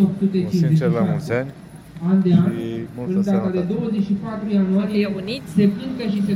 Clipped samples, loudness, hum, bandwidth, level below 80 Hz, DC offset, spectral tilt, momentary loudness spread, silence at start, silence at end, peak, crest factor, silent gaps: under 0.1%; -20 LUFS; none; 11 kHz; -52 dBFS; under 0.1%; -8.5 dB/octave; 10 LU; 0 s; 0 s; -4 dBFS; 16 dB; none